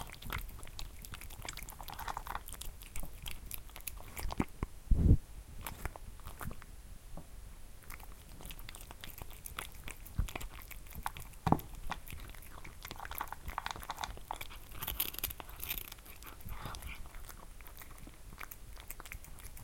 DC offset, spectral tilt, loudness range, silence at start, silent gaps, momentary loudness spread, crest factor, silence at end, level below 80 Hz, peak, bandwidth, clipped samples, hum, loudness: under 0.1%; -4.5 dB/octave; 11 LU; 0 s; none; 16 LU; 30 dB; 0 s; -44 dBFS; -10 dBFS; 17 kHz; under 0.1%; none; -42 LUFS